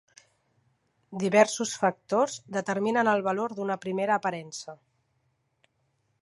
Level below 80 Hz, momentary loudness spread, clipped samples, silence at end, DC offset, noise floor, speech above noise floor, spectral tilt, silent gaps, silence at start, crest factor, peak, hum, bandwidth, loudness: -78 dBFS; 16 LU; under 0.1%; 1.5 s; under 0.1%; -74 dBFS; 47 dB; -4.5 dB/octave; none; 1.1 s; 22 dB; -6 dBFS; none; 11.5 kHz; -27 LUFS